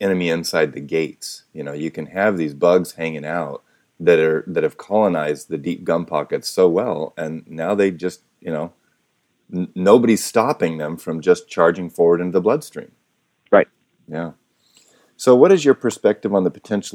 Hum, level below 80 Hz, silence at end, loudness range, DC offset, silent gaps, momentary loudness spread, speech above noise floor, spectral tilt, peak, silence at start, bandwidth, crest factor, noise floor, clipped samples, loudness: none; -64 dBFS; 0.05 s; 4 LU; under 0.1%; none; 15 LU; 49 dB; -5.5 dB/octave; 0 dBFS; 0 s; 17 kHz; 20 dB; -67 dBFS; under 0.1%; -19 LUFS